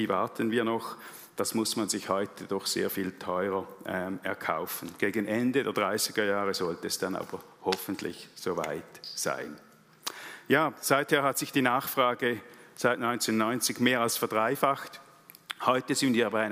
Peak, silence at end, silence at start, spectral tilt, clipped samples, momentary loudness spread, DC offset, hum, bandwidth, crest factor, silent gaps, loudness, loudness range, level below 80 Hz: -8 dBFS; 0 s; 0 s; -3.5 dB/octave; under 0.1%; 12 LU; under 0.1%; none; 16 kHz; 22 dB; none; -29 LUFS; 5 LU; -78 dBFS